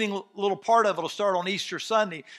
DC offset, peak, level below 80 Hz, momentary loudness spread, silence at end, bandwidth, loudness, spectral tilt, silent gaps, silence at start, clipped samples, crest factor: under 0.1%; -8 dBFS; -84 dBFS; 7 LU; 0 s; 13.5 kHz; -26 LUFS; -3.5 dB/octave; none; 0 s; under 0.1%; 18 dB